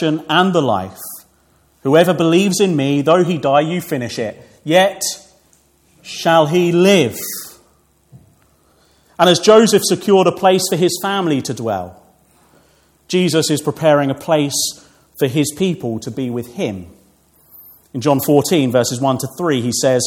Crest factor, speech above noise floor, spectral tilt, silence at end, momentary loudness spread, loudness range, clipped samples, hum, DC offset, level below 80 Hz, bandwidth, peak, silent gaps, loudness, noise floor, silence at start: 16 dB; 41 dB; -4.5 dB/octave; 0 s; 13 LU; 5 LU; under 0.1%; none; under 0.1%; -60 dBFS; 18 kHz; 0 dBFS; none; -15 LUFS; -55 dBFS; 0 s